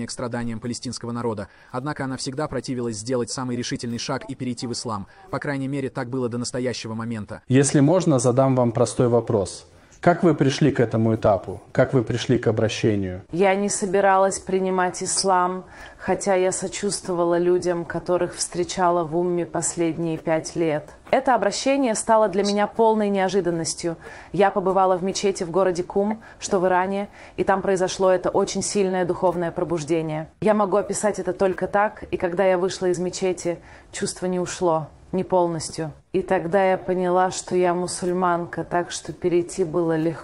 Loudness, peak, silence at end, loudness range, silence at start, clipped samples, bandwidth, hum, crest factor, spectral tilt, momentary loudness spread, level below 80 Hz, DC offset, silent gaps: -22 LUFS; -4 dBFS; 0 s; 7 LU; 0 s; under 0.1%; 12 kHz; none; 18 dB; -5 dB/octave; 10 LU; -52 dBFS; under 0.1%; none